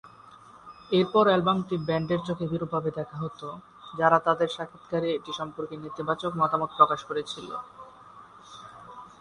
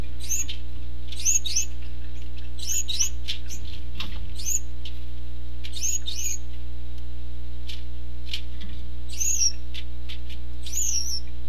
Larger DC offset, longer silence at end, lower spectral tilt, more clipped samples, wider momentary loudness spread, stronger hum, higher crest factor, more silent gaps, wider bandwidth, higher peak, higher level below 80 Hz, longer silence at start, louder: second, under 0.1% vs 10%; about the same, 0.1 s vs 0 s; first, -6.5 dB/octave vs -1 dB/octave; neither; first, 23 LU vs 16 LU; second, none vs 60 Hz at -35 dBFS; about the same, 24 dB vs 20 dB; neither; second, 11 kHz vs 14 kHz; first, -4 dBFS vs -8 dBFS; second, -64 dBFS vs -36 dBFS; about the same, 0.05 s vs 0 s; about the same, -27 LUFS vs -29 LUFS